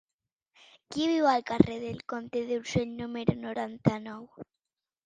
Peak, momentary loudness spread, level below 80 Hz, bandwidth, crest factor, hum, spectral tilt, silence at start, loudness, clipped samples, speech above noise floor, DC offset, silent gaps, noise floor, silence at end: -4 dBFS; 15 LU; -56 dBFS; 9.4 kHz; 28 dB; none; -6.5 dB/octave; 0.9 s; -30 LUFS; under 0.1%; over 61 dB; under 0.1%; none; under -90 dBFS; 0.65 s